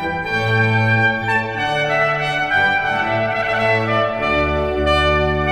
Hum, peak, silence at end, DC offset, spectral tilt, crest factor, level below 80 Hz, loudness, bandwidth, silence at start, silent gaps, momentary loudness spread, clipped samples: none; -4 dBFS; 0 s; under 0.1%; -6 dB/octave; 14 dB; -32 dBFS; -17 LUFS; 12 kHz; 0 s; none; 4 LU; under 0.1%